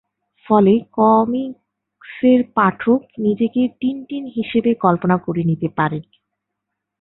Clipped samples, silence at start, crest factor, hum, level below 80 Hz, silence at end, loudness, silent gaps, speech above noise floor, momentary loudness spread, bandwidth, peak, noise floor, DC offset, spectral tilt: under 0.1%; 0.5 s; 16 dB; none; -58 dBFS; 1 s; -18 LUFS; none; 63 dB; 10 LU; 4.1 kHz; -2 dBFS; -79 dBFS; under 0.1%; -12.5 dB/octave